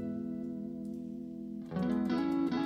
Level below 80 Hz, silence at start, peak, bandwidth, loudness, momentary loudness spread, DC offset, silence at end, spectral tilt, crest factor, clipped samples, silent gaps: -64 dBFS; 0 s; -22 dBFS; 9.4 kHz; -36 LUFS; 11 LU; under 0.1%; 0 s; -8 dB/octave; 14 dB; under 0.1%; none